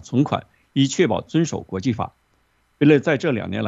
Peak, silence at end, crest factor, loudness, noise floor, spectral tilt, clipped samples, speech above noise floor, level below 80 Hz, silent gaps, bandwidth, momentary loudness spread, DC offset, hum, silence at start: -4 dBFS; 0 s; 18 dB; -21 LUFS; -64 dBFS; -6 dB/octave; under 0.1%; 44 dB; -56 dBFS; none; 8 kHz; 11 LU; under 0.1%; none; 0.05 s